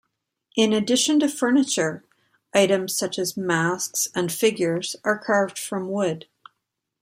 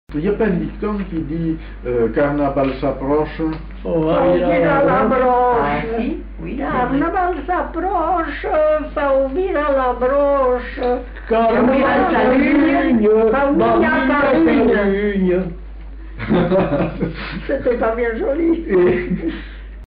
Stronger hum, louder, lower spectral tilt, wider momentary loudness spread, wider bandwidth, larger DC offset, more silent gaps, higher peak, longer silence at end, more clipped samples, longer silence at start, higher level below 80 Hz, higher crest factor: neither; second, -22 LUFS vs -17 LUFS; second, -3.5 dB/octave vs -5.5 dB/octave; about the same, 8 LU vs 10 LU; first, 16 kHz vs 5.2 kHz; neither; neither; about the same, -4 dBFS vs -6 dBFS; first, 0.8 s vs 0 s; neither; first, 0.55 s vs 0.1 s; second, -70 dBFS vs -32 dBFS; first, 18 dB vs 10 dB